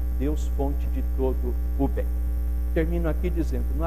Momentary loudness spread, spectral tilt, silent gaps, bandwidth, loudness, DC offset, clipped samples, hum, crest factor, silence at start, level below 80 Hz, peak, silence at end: 3 LU; -8.5 dB/octave; none; 14.5 kHz; -27 LUFS; 2%; under 0.1%; none; 14 dB; 0 s; -26 dBFS; -12 dBFS; 0 s